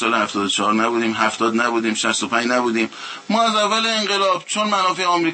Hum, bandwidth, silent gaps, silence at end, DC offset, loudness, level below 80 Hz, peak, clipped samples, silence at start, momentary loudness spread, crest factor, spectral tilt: none; 8.8 kHz; none; 0 s; under 0.1%; -18 LUFS; -70 dBFS; -2 dBFS; under 0.1%; 0 s; 3 LU; 16 dB; -2.5 dB/octave